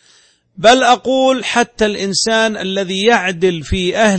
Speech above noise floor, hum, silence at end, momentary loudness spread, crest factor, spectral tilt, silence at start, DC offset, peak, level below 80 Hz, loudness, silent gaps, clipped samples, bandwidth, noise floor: 38 dB; none; 0 s; 7 LU; 14 dB; -3.5 dB/octave; 0.6 s; under 0.1%; 0 dBFS; -36 dBFS; -14 LUFS; none; under 0.1%; 8.8 kHz; -51 dBFS